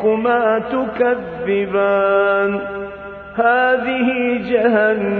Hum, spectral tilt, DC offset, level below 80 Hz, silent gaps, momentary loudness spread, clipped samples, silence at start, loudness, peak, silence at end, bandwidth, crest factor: none; -8.5 dB/octave; under 0.1%; -50 dBFS; none; 10 LU; under 0.1%; 0 s; -17 LUFS; -2 dBFS; 0 s; 4.6 kHz; 14 dB